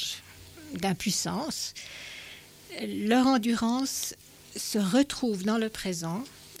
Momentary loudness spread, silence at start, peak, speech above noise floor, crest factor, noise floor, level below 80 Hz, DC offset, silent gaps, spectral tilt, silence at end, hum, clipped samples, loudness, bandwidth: 18 LU; 0 s; -12 dBFS; 20 dB; 16 dB; -48 dBFS; -60 dBFS; under 0.1%; none; -4 dB/octave; 0 s; none; under 0.1%; -29 LUFS; 16.5 kHz